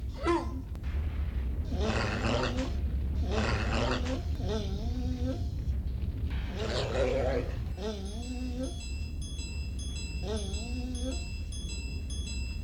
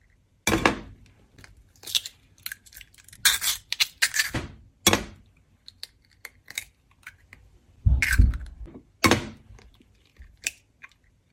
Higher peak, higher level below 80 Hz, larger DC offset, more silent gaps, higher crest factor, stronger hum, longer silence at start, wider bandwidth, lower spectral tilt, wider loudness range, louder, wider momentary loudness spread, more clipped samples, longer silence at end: second, -16 dBFS vs -2 dBFS; about the same, -36 dBFS vs -34 dBFS; neither; neither; second, 18 dB vs 26 dB; neither; second, 0 s vs 0.45 s; second, 10.5 kHz vs 16.5 kHz; first, -5.5 dB/octave vs -3 dB/octave; about the same, 5 LU vs 5 LU; second, -34 LUFS vs -25 LUFS; second, 8 LU vs 23 LU; neither; second, 0 s vs 0.8 s